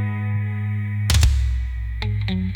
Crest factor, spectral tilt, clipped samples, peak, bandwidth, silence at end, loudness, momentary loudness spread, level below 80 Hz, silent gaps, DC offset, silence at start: 16 dB; -5 dB/octave; under 0.1%; -6 dBFS; 18.5 kHz; 0 s; -22 LUFS; 9 LU; -24 dBFS; none; under 0.1%; 0 s